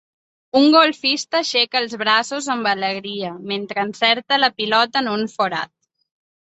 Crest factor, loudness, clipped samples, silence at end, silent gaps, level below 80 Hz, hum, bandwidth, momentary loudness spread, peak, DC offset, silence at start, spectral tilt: 18 dB; -18 LUFS; under 0.1%; 0.8 s; none; -68 dBFS; none; 8.2 kHz; 12 LU; -2 dBFS; under 0.1%; 0.55 s; -3 dB/octave